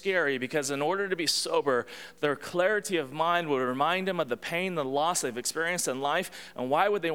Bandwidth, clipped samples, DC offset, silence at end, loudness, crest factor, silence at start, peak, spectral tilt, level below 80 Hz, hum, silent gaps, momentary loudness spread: 17.5 kHz; under 0.1%; 0.1%; 0 s; -28 LUFS; 18 dB; 0 s; -10 dBFS; -3 dB/octave; -70 dBFS; none; none; 5 LU